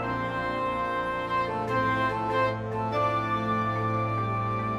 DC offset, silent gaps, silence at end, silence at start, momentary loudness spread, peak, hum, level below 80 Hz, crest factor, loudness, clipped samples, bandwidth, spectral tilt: under 0.1%; none; 0 s; 0 s; 3 LU; -14 dBFS; none; -52 dBFS; 14 dB; -28 LUFS; under 0.1%; 11 kHz; -7 dB/octave